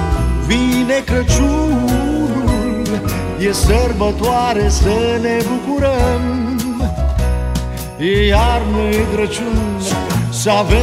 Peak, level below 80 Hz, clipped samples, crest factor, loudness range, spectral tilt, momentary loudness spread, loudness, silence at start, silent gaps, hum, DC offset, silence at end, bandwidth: -2 dBFS; -20 dBFS; under 0.1%; 14 dB; 1 LU; -5.5 dB/octave; 5 LU; -16 LUFS; 0 s; none; none; under 0.1%; 0 s; 16 kHz